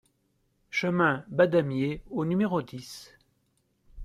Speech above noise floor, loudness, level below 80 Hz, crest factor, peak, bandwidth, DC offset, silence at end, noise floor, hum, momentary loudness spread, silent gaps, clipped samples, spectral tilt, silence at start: 45 dB; -27 LUFS; -58 dBFS; 20 dB; -8 dBFS; 14 kHz; under 0.1%; 0 s; -72 dBFS; none; 17 LU; none; under 0.1%; -7 dB/octave; 0.7 s